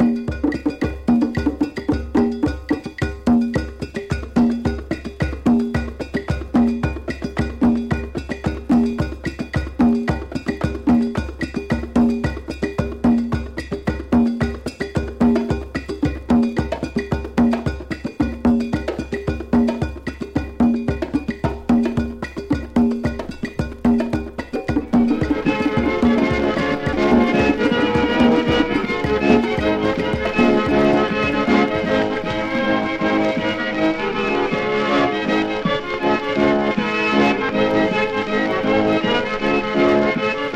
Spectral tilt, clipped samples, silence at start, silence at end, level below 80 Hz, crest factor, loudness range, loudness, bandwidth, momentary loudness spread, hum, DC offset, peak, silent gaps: -7 dB/octave; under 0.1%; 0 s; 0 s; -34 dBFS; 18 dB; 4 LU; -20 LUFS; 9.8 kHz; 9 LU; none; under 0.1%; 0 dBFS; none